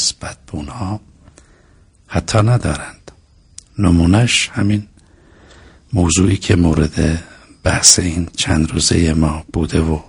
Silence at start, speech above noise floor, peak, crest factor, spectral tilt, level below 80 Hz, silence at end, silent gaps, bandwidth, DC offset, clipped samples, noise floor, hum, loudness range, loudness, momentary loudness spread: 0 s; 35 dB; 0 dBFS; 16 dB; -4 dB/octave; -30 dBFS; 0.05 s; none; 11 kHz; under 0.1%; under 0.1%; -49 dBFS; none; 7 LU; -15 LUFS; 14 LU